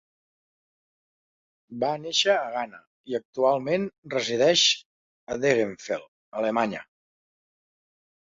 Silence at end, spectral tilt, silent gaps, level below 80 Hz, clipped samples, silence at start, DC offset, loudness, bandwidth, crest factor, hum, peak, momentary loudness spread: 1.45 s; -3 dB/octave; 2.87-3.04 s, 3.25-3.33 s, 3.98-4.03 s, 4.85-5.27 s, 6.08-6.32 s; -70 dBFS; under 0.1%; 1.7 s; under 0.1%; -25 LUFS; 7.8 kHz; 22 dB; none; -6 dBFS; 13 LU